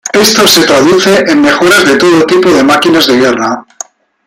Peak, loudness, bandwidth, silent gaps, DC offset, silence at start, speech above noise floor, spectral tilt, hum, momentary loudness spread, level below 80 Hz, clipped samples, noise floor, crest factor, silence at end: 0 dBFS; -6 LUFS; 17.5 kHz; none; under 0.1%; 0.05 s; 22 dB; -3 dB/octave; none; 11 LU; -46 dBFS; 0.3%; -28 dBFS; 6 dB; 0.65 s